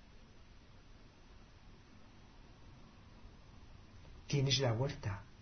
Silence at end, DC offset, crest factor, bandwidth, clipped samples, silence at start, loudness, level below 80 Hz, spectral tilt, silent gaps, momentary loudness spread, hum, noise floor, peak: 0.05 s; under 0.1%; 22 dB; 6.4 kHz; under 0.1%; 0 s; -36 LUFS; -58 dBFS; -4.5 dB/octave; none; 28 LU; none; -59 dBFS; -20 dBFS